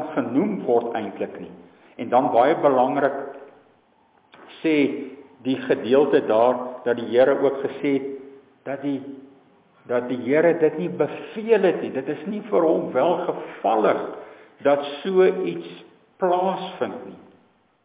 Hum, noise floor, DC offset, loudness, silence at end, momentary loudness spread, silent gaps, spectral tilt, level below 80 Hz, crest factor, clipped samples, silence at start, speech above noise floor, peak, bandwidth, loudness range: none; -60 dBFS; under 0.1%; -22 LUFS; 0.7 s; 16 LU; none; -10 dB/octave; -74 dBFS; 16 dB; under 0.1%; 0 s; 38 dB; -6 dBFS; 4 kHz; 4 LU